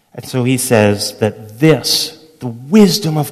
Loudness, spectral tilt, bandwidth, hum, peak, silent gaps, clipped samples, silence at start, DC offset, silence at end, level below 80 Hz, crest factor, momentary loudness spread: -13 LUFS; -5 dB/octave; 14.5 kHz; none; 0 dBFS; none; 0.3%; 0.15 s; under 0.1%; 0 s; -50 dBFS; 14 dB; 13 LU